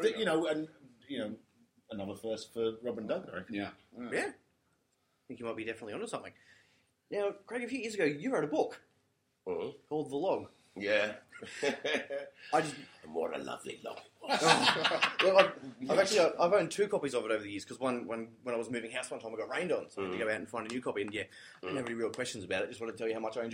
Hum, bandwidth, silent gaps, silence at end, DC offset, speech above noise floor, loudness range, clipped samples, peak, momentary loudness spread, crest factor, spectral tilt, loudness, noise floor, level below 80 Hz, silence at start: none; 16 kHz; none; 0 s; under 0.1%; 43 dB; 12 LU; under 0.1%; -6 dBFS; 16 LU; 28 dB; -3.5 dB/octave; -34 LUFS; -77 dBFS; -76 dBFS; 0 s